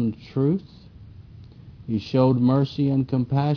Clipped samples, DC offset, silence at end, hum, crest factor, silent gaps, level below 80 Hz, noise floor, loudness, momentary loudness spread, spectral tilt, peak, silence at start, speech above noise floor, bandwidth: under 0.1%; under 0.1%; 0 s; none; 16 dB; none; -52 dBFS; -44 dBFS; -23 LUFS; 10 LU; -10 dB/octave; -6 dBFS; 0 s; 23 dB; 5.4 kHz